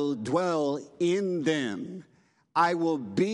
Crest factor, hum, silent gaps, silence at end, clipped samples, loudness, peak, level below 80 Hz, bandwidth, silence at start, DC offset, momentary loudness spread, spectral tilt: 18 dB; none; none; 0 s; under 0.1%; -28 LUFS; -10 dBFS; -76 dBFS; 11 kHz; 0 s; under 0.1%; 10 LU; -6 dB/octave